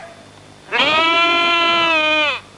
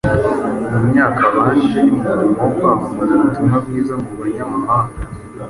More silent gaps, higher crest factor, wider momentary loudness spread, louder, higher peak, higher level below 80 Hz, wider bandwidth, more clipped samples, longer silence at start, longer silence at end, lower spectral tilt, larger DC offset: neither; about the same, 14 dB vs 14 dB; second, 4 LU vs 9 LU; about the same, -14 LUFS vs -15 LUFS; about the same, -4 dBFS vs -2 dBFS; second, -58 dBFS vs -38 dBFS; about the same, 11.5 kHz vs 11.5 kHz; neither; about the same, 0 s vs 0.05 s; first, 0.15 s vs 0 s; second, -2 dB/octave vs -8.5 dB/octave; neither